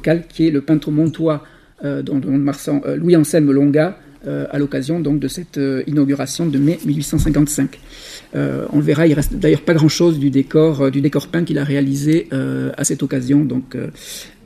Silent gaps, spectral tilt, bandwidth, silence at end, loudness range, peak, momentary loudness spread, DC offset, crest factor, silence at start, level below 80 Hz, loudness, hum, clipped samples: none; -6.5 dB/octave; 15.5 kHz; 0.2 s; 3 LU; 0 dBFS; 11 LU; under 0.1%; 16 dB; 0 s; -36 dBFS; -17 LUFS; none; under 0.1%